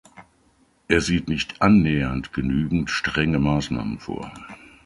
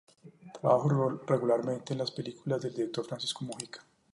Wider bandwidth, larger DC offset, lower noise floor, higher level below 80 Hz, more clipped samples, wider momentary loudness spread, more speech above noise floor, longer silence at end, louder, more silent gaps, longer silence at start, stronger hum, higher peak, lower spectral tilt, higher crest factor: about the same, 11.5 kHz vs 11.5 kHz; neither; first, -61 dBFS vs -51 dBFS; first, -40 dBFS vs -76 dBFS; neither; about the same, 16 LU vs 14 LU; first, 39 dB vs 20 dB; about the same, 0.3 s vs 0.35 s; first, -22 LUFS vs -32 LUFS; neither; about the same, 0.15 s vs 0.25 s; neither; first, -2 dBFS vs -12 dBFS; about the same, -6 dB/octave vs -6 dB/octave; about the same, 20 dB vs 20 dB